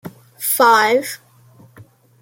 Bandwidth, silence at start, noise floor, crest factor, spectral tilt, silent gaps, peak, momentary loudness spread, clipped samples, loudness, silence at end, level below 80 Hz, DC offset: 17 kHz; 0.05 s; -48 dBFS; 18 dB; -2 dB/octave; none; -2 dBFS; 18 LU; under 0.1%; -14 LUFS; 0.4 s; -68 dBFS; under 0.1%